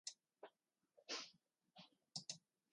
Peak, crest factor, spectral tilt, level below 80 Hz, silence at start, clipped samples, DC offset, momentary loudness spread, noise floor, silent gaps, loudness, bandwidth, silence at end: -32 dBFS; 26 dB; -1 dB/octave; under -90 dBFS; 0.05 s; under 0.1%; under 0.1%; 16 LU; -84 dBFS; none; -53 LUFS; 11 kHz; 0.35 s